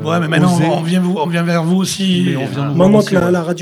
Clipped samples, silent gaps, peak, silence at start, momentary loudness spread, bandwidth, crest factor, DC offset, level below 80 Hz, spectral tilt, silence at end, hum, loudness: under 0.1%; none; 0 dBFS; 0 s; 5 LU; 13.5 kHz; 14 dB; under 0.1%; -50 dBFS; -6 dB/octave; 0 s; none; -14 LUFS